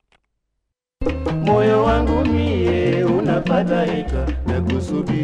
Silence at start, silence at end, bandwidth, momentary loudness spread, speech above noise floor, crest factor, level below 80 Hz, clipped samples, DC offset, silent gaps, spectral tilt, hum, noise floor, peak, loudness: 1 s; 0 s; 9.8 kHz; 7 LU; 58 dB; 14 dB; -30 dBFS; under 0.1%; under 0.1%; none; -8 dB/octave; none; -77 dBFS; -4 dBFS; -19 LUFS